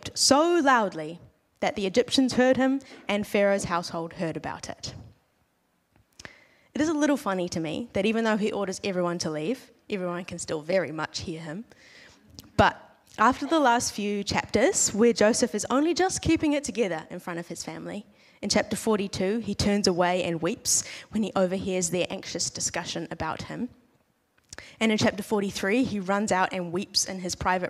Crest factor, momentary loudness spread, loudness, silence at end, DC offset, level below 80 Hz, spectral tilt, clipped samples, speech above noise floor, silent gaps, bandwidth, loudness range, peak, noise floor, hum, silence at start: 20 dB; 14 LU; -26 LUFS; 0 s; under 0.1%; -54 dBFS; -3.5 dB/octave; under 0.1%; 45 dB; none; 15.5 kHz; 7 LU; -6 dBFS; -71 dBFS; none; 0.05 s